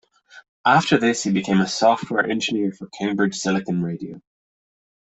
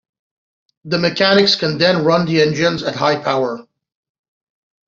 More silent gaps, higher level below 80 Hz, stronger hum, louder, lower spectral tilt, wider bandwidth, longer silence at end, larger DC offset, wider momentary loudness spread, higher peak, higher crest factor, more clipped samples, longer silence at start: first, 0.48-0.64 s vs none; about the same, -60 dBFS vs -56 dBFS; neither; second, -21 LUFS vs -15 LUFS; about the same, -4.5 dB/octave vs -5 dB/octave; first, 8.4 kHz vs 7.6 kHz; second, 1 s vs 1.25 s; neither; about the same, 10 LU vs 8 LU; about the same, -2 dBFS vs -2 dBFS; about the same, 18 dB vs 16 dB; neither; second, 0.35 s vs 0.85 s